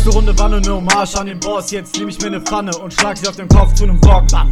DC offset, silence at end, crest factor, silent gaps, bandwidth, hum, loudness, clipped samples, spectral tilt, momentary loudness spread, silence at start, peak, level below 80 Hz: under 0.1%; 0 s; 12 dB; none; 12 kHz; none; -15 LUFS; 0.6%; -4.5 dB/octave; 10 LU; 0 s; 0 dBFS; -14 dBFS